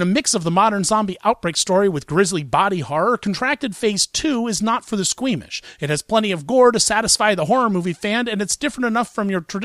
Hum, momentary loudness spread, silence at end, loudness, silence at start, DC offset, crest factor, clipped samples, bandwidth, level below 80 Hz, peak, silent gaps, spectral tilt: none; 7 LU; 0 s; -19 LUFS; 0 s; under 0.1%; 16 dB; under 0.1%; 14.5 kHz; -52 dBFS; -2 dBFS; none; -3.5 dB/octave